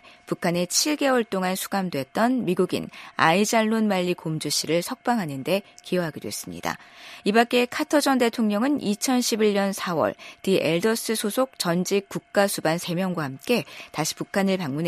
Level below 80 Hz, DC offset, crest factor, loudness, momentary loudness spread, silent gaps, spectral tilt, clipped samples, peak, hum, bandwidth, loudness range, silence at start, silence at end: -66 dBFS; under 0.1%; 20 dB; -24 LUFS; 9 LU; none; -4 dB/octave; under 0.1%; -4 dBFS; none; 15 kHz; 3 LU; 0.3 s; 0 s